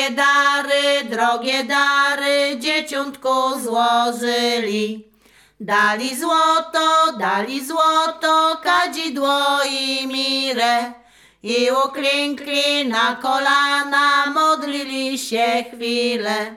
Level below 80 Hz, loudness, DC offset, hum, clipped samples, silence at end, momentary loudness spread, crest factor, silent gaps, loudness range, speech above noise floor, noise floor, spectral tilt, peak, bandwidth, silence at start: -66 dBFS; -18 LUFS; under 0.1%; none; under 0.1%; 0 s; 7 LU; 14 dB; none; 2 LU; 35 dB; -53 dBFS; -2 dB/octave; -4 dBFS; 17 kHz; 0 s